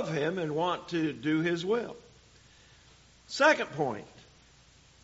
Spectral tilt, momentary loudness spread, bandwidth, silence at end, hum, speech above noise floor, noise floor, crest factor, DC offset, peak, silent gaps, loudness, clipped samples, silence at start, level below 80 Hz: -3.5 dB/octave; 16 LU; 8 kHz; 0.85 s; none; 30 dB; -59 dBFS; 22 dB; under 0.1%; -10 dBFS; none; -29 LUFS; under 0.1%; 0 s; -66 dBFS